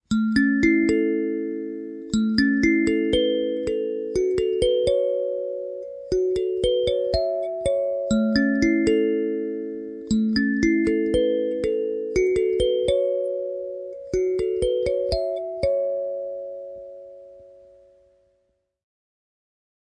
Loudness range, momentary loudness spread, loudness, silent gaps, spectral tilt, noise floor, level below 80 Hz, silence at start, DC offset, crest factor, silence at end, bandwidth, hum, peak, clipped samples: 6 LU; 12 LU; -23 LUFS; none; -5.5 dB/octave; -71 dBFS; -44 dBFS; 0.1 s; under 0.1%; 18 dB; 2.45 s; 11 kHz; none; -6 dBFS; under 0.1%